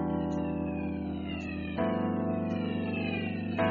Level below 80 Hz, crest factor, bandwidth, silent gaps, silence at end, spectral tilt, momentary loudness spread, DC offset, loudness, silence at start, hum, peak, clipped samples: -52 dBFS; 18 dB; 7 kHz; none; 0 s; -6 dB/octave; 5 LU; under 0.1%; -33 LUFS; 0 s; none; -14 dBFS; under 0.1%